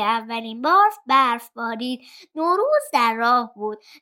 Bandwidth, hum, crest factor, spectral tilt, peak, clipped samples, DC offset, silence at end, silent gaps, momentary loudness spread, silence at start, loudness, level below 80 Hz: 17 kHz; none; 16 dB; -3 dB/octave; -4 dBFS; under 0.1%; under 0.1%; 0.25 s; none; 13 LU; 0 s; -20 LUFS; -82 dBFS